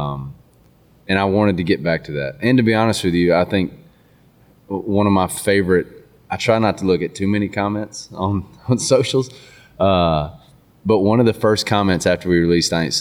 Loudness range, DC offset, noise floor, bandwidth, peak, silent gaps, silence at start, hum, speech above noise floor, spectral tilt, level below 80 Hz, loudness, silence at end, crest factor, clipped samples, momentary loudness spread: 3 LU; under 0.1%; -52 dBFS; 16.5 kHz; -4 dBFS; none; 0 s; none; 35 dB; -5.5 dB/octave; -44 dBFS; -18 LUFS; 0 s; 14 dB; under 0.1%; 11 LU